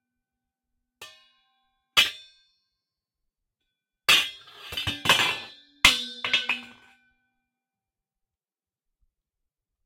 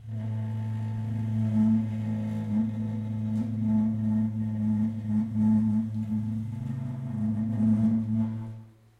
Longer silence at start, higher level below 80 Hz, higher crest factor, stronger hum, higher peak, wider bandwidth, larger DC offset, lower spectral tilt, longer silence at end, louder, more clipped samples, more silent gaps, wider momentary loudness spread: first, 1 s vs 0 s; about the same, -54 dBFS vs -58 dBFS; first, 26 dB vs 12 dB; neither; first, -4 dBFS vs -14 dBFS; first, 16.5 kHz vs 4 kHz; neither; second, -0.5 dB/octave vs -10 dB/octave; first, 3.2 s vs 0.3 s; first, -22 LUFS vs -28 LUFS; neither; neither; first, 15 LU vs 9 LU